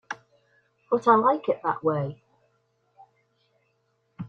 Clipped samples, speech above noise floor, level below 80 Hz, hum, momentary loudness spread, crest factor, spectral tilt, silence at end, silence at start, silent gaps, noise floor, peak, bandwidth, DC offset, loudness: under 0.1%; 49 dB; -70 dBFS; 50 Hz at -55 dBFS; 17 LU; 24 dB; -7.5 dB/octave; 0 s; 0.1 s; none; -72 dBFS; -4 dBFS; 7.6 kHz; under 0.1%; -24 LUFS